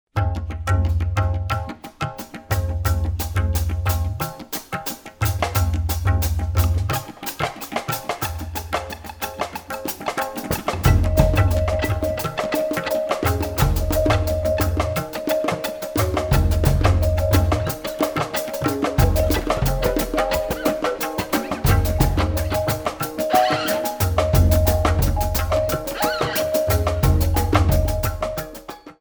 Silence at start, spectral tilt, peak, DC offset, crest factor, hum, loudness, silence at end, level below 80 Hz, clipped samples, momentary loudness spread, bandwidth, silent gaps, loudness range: 0.15 s; -5.5 dB/octave; -2 dBFS; under 0.1%; 20 dB; none; -22 LUFS; 0.1 s; -26 dBFS; under 0.1%; 9 LU; over 20 kHz; none; 5 LU